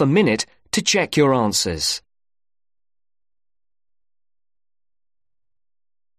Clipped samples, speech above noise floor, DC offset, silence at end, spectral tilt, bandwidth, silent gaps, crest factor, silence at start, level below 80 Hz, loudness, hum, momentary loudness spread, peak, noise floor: under 0.1%; over 71 dB; under 0.1%; 4.2 s; -4 dB/octave; 13.5 kHz; none; 20 dB; 0 s; -52 dBFS; -19 LUFS; none; 7 LU; -4 dBFS; under -90 dBFS